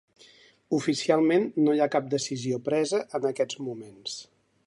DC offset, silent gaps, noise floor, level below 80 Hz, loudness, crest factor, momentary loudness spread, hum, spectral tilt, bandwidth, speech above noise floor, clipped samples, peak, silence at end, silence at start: under 0.1%; none; -56 dBFS; -76 dBFS; -27 LUFS; 18 dB; 14 LU; none; -5 dB/octave; 11.5 kHz; 30 dB; under 0.1%; -8 dBFS; 0.45 s; 0.7 s